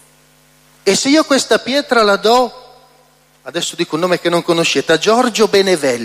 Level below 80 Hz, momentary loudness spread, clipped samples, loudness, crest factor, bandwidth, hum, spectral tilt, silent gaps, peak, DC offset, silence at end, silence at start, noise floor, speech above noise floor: -56 dBFS; 8 LU; under 0.1%; -13 LUFS; 14 dB; 15.5 kHz; 50 Hz at -50 dBFS; -3 dB/octave; none; 0 dBFS; under 0.1%; 0 s; 0.85 s; -51 dBFS; 37 dB